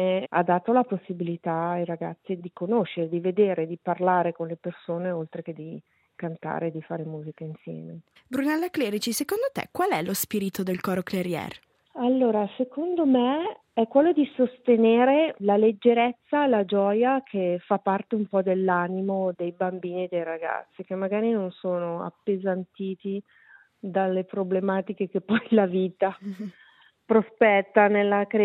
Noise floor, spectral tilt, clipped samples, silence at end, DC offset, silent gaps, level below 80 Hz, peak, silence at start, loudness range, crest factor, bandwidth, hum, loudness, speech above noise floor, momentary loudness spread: -56 dBFS; -6 dB/octave; under 0.1%; 0 s; under 0.1%; none; -74 dBFS; -4 dBFS; 0 s; 8 LU; 20 dB; 16 kHz; none; -25 LUFS; 31 dB; 14 LU